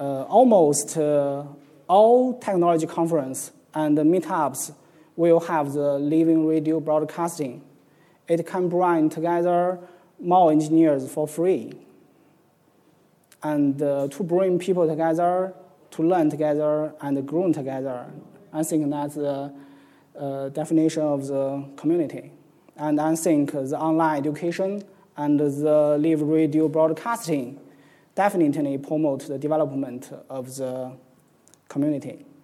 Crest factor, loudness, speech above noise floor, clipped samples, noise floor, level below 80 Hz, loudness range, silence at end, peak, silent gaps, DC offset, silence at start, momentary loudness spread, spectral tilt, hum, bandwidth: 18 dB; -23 LUFS; 38 dB; under 0.1%; -60 dBFS; -78 dBFS; 6 LU; 0.25 s; -6 dBFS; none; under 0.1%; 0 s; 14 LU; -6.5 dB/octave; none; 14.5 kHz